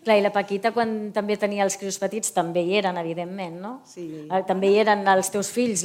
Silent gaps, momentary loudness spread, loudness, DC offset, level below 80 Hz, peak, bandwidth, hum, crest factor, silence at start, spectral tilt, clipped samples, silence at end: none; 14 LU; -23 LUFS; under 0.1%; -72 dBFS; -6 dBFS; 16.5 kHz; none; 18 dB; 0.05 s; -4 dB/octave; under 0.1%; 0 s